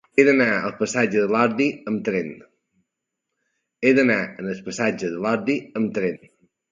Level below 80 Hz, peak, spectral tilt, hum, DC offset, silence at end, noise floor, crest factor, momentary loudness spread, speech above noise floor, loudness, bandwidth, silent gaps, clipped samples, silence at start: -66 dBFS; 0 dBFS; -5.5 dB/octave; none; under 0.1%; 0.55 s; -81 dBFS; 22 dB; 11 LU; 60 dB; -21 LUFS; 9.4 kHz; none; under 0.1%; 0.15 s